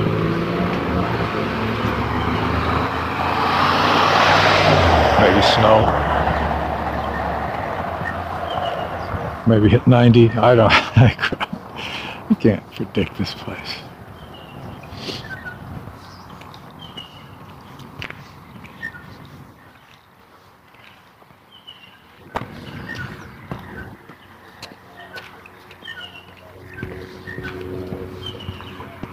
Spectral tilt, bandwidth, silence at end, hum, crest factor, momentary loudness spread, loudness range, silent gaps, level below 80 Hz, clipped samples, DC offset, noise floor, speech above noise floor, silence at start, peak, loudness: -6.5 dB/octave; 15.5 kHz; 0 s; none; 20 dB; 25 LU; 22 LU; none; -36 dBFS; under 0.1%; under 0.1%; -49 dBFS; 34 dB; 0 s; 0 dBFS; -18 LUFS